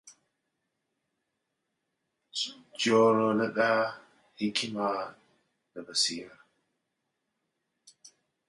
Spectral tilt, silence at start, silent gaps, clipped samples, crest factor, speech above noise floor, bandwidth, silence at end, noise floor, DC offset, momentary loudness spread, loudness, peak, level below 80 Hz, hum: -3.5 dB/octave; 0.05 s; none; under 0.1%; 22 dB; 54 dB; 11.5 kHz; 2.2 s; -82 dBFS; under 0.1%; 18 LU; -28 LUFS; -10 dBFS; -78 dBFS; none